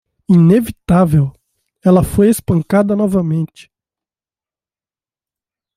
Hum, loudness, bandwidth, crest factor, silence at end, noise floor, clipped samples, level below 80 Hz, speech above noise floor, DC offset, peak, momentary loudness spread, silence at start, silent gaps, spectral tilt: none; -13 LUFS; 15.5 kHz; 14 dB; 2.3 s; under -90 dBFS; under 0.1%; -38 dBFS; over 78 dB; under 0.1%; -2 dBFS; 8 LU; 0.3 s; none; -8 dB/octave